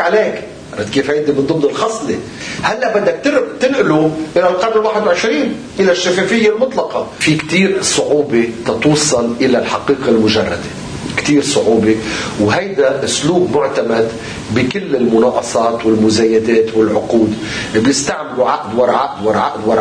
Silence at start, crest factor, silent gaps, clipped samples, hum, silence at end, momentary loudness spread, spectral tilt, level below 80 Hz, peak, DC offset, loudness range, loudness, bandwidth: 0 s; 12 dB; none; under 0.1%; none; 0 s; 7 LU; -4.5 dB/octave; -44 dBFS; -2 dBFS; under 0.1%; 2 LU; -14 LUFS; 10.5 kHz